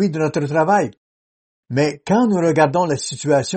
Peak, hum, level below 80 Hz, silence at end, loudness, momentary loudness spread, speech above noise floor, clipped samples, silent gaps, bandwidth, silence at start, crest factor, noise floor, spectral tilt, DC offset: -2 dBFS; none; -58 dBFS; 0 s; -18 LUFS; 6 LU; over 73 dB; under 0.1%; 0.97-1.63 s; 8.8 kHz; 0 s; 16 dB; under -90 dBFS; -5.5 dB/octave; under 0.1%